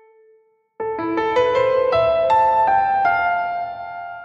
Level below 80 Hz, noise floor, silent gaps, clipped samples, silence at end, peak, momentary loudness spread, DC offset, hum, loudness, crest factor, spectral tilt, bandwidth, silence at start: -52 dBFS; -57 dBFS; none; under 0.1%; 0 s; -6 dBFS; 13 LU; under 0.1%; none; -18 LUFS; 12 dB; -6 dB/octave; 8 kHz; 0.8 s